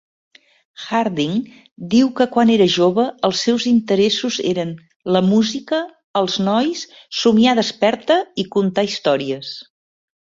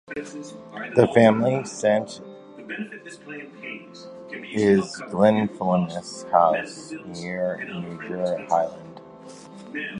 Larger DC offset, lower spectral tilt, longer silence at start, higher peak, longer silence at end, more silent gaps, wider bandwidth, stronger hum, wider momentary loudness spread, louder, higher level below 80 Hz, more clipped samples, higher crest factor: neither; about the same, -5 dB/octave vs -6 dB/octave; first, 0.8 s vs 0.1 s; about the same, -2 dBFS vs -2 dBFS; first, 0.7 s vs 0 s; first, 1.71-1.76 s, 4.96-5.00 s, 6.04-6.14 s vs none; second, 7.8 kHz vs 10.5 kHz; neither; second, 12 LU vs 22 LU; first, -17 LUFS vs -23 LUFS; about the same, -60 dBFS vs -62 dBFS; neither; second, 16 dB vs 22 dB